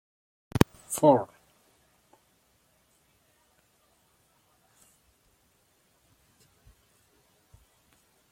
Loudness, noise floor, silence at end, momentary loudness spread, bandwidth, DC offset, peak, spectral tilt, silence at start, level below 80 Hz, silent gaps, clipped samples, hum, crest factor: -26 LUFS; -68 dBFS; 7.05 s; 15 LU; 16.5 kHz; under 0.1%; -4 dBFS; -6 dB/octave; 0.55 s; -58 dBFS; none; under 0.1%; none; 30 dB